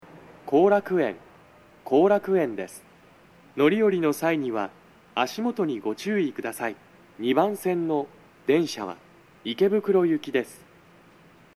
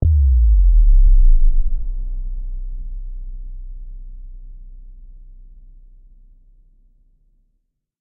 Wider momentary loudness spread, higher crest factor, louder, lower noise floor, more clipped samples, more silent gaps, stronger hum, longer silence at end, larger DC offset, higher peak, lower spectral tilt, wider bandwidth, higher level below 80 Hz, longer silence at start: second, 18 LU vs 25 LU; first, 18 dB vs 12 dB; second, -25 LUFS vs -19 LUFS; second, -54 dBFS vs -69 dBFS; neither; neither; neither; second, 1 s vs 2.95 s; neither; second, -8 dBFS vs -4 dBFS; second, -6 dB/octave vs -13.5 dB/octave; first, 13.5 kHz vs 0.7 kHz; second, -70 dBFS vs -16 dBFS; first, 0.15 s vs 0 s